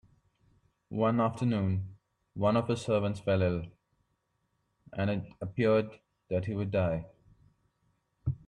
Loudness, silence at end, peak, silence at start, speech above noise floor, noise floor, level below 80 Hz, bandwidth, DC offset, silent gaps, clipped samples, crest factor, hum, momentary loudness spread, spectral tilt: -31 LUFS; 0.1 s; -16 dBFS; 0.9 s; 48 dB; -78 dBFS; -58 dBFS; 10.5 kHz; under 0.1%; none; under 0.1%; 18 dB; none; 14 LU; -8 dB/octave